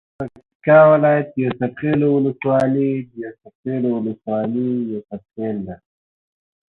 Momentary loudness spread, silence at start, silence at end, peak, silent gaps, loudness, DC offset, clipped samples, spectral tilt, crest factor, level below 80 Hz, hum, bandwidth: 20 LU; 0.2 s; 1 s; -2 dBFS; 0.55-0.60 s, 3.55-3.63 s; -18 LUFS; under 0.1%; under 0.1%; -9.5 dB/octave; 18 dB; -58 dBFS; none; 4.5 kHz